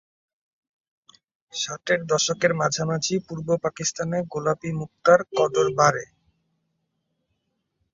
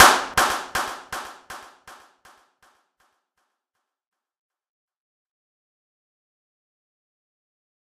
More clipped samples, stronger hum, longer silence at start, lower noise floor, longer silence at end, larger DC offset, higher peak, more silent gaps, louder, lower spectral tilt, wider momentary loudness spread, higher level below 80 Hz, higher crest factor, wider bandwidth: neither; neither; first, 1.55 s vs 0 s; second, -76 dBFS vs -82 dBFS; second, 1.9 s vs 6.4 s; neither; second, -4 dBFS vs 0 dBFS; neither; about the same, -23 LUFS vs -22 LUFS; first, -4 dB/octave vs -0.5 dB/octave; second, 10 LU vs 22 LU; second, -64 dBFS vs -56 dBFS; second, 22 dB vs 28 dB; second, 7.8 kHz vs 15.5 kHz